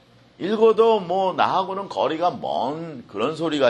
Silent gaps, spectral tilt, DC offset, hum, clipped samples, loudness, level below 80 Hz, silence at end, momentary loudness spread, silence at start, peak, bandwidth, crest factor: none; -6 dB/octave; under 0.1%; none; under 0.1%; -22 LUFS; -66 dBFS; 0 s; 10 LU; 0.4 s; -4 dBFS; 9.2 kHz; 18 dB